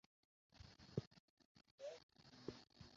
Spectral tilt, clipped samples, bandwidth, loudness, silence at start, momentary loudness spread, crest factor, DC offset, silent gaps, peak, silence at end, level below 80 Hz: -6 dB/octave; under 0.1%; 7.4 kHz; -56 LUFS; 0.5 s; 14 LU; 28 dB; under 0.1%; 1.07-1.11 s, 1.20-1.37 s, 1.45-1.55 s, 1.71-1.78 s, 2.03-2.09 s; -30 dBFS; 0 s; -76 dBFS